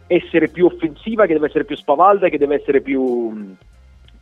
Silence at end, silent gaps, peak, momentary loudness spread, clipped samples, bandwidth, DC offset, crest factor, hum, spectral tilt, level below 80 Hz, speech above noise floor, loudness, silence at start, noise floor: 0.65 s; none; 0 dBFS; 11 LU; under 0.1%; 4.1 kHz; under 0.1%; 16 dB; none; -8 dB/octave; -48 dBFS; 29 dB; -17 LUFS; 0.1 s; -45 dBFS